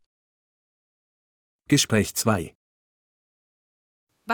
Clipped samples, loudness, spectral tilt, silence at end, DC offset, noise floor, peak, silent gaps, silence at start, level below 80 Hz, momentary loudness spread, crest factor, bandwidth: under 0.1%; -22 LUFS; -4 dB/octave; 0 s; under 0.1%; under -90 dBFS; -6 dBFS; 2.55-4.07 s; 1.7 s; -58 dBFS; 8 LU; 24 dB; over 20 kHz